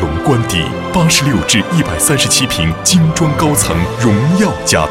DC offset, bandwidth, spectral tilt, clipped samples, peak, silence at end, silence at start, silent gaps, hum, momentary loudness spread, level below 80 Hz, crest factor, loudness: under 0.1%; 16.5 kHz; -4 dB/octave; under 0.1%; 0 dBFS; 0 s; 0 s; none; none; 4 LU; -30 dBFS; 12 dB; -12 LUFS